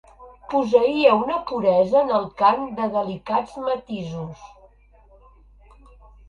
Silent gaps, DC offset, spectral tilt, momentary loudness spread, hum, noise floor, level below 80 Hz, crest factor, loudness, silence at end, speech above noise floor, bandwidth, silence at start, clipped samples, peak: none; under 0.1%; -7 dB/octave; 13 LU; none; -53 dBFS; -54 dBFS; 20 dB; -21 LUFS; 1.85 s; 32 dB; 7.2 kHz; 0.2 s; under 0.1%; -2 dBFS